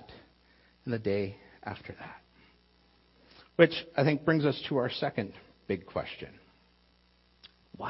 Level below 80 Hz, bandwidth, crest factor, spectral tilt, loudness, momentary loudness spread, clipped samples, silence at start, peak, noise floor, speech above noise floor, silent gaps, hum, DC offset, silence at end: -64 dBFS; 5.8 kHz; 26 dB; -10 dB/octave; -31 LUFS; 20 LU; under 0.1%; 0 s; -6 dBFS; -66 dBFS; 36 dB; none; 60 Hz at -65 dBFS; under 0.1%; 0 s